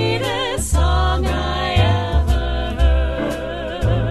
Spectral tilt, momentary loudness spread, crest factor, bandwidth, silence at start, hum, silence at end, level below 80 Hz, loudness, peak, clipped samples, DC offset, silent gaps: -5.5 dB/octave; 6 LU; 14 dB; 13 kHz; 0 s; none; 0 s; -20 dBFS; -19 LUFS; -4 dBFS; under 0.1%; under 0.1%; none